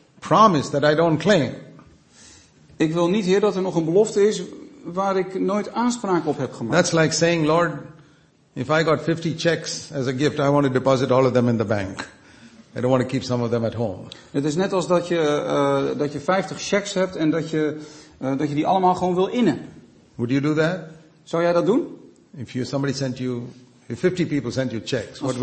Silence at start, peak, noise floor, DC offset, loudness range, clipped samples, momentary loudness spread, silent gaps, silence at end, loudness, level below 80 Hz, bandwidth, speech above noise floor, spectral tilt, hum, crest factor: 0.2 s; -2 dBFS; -55 dBFS; under 0.1%; 3 LU; under 0.1%; 13 LU; none; 0 s; -21 LUFS; -58 dBFS; 8.8 kHz; 35 dB; -5.5 dB/octave; none; 20 dB